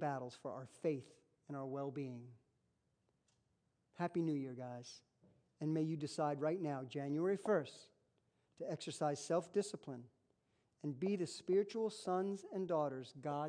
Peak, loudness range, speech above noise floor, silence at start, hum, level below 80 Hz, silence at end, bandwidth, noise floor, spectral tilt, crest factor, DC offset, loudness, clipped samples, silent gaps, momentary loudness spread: -24 dBFS; 6 LU; 41 dB; 0 s; none; -90 dBFS; 0 s; 10.5 kHz; -82 dBFS; -6.5 dB/octave; 20 dB; under 0.1%; -42 LUFS; under 0.1%; none; 13 LU